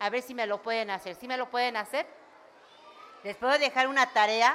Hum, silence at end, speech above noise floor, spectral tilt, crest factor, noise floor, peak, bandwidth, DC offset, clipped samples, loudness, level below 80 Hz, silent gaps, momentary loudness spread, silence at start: none; 0 s; 27 dB; -1.5 dB/octave; 22 dB; -55 dBFS; -8 dBFS; 16.5 kHz; under 0.1%; under 0.1%; -28 LUFS; -78 dBFS; none; 12 LU; 0 s